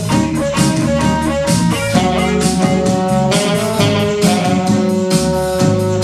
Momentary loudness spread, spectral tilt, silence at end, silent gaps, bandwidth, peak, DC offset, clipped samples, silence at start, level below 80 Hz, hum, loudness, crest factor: 2 LU; -5.5 dB/octave; 0 s; none; 14.5 kHz; 0 dBFS; under 0.1%; under 0.1%; 0 s; -34 dBFS; none; -14 LUFS; 14 dB